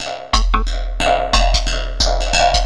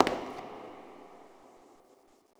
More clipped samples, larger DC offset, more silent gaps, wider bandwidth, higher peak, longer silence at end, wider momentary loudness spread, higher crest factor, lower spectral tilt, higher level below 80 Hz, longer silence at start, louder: neither; neither; neither; second, 11.5 kHz vs over 20 kHz; first, 0 dBFS vs -4 dBFS; second, 0 s vs 0.8 s; second, 5 LU vs 22 LU; second, 16 dB vs 32 dB; second, -3 dB/octave vs -4.5 dB/octave; first, -18 dBFS vs -66 dBFS; about the same, 0 s vs 0 s; first, -17 LUFS vs -37 LUFS